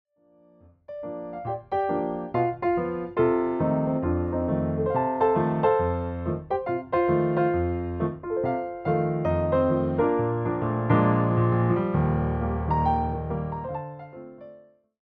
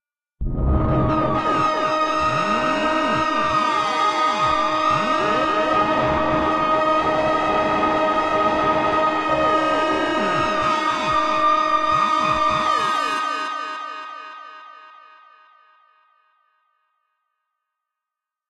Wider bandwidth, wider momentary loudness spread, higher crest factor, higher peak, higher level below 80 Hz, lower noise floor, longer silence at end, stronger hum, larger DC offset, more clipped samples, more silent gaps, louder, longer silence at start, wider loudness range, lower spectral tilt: second, 4.6 kHz vs 12 kHz; first, 11 LU vs 7 LU; about the same, 16 dB vs 14 dB; about the same, -8 dBFS vs -6 dBFS; second, -44 dBFS vs -36 dBFS; second, -59 dBFS vs -86 dBFS; second, 0.45 s vs 3.6 s; neither; neither; neither; neither; second, -25 LUFS vs -19 LUFS; first, 0.9 s vs 0.4 s; about the same, 4 LU vs 6 LU; first, -11.5 dB/octave vs -5 dB/octave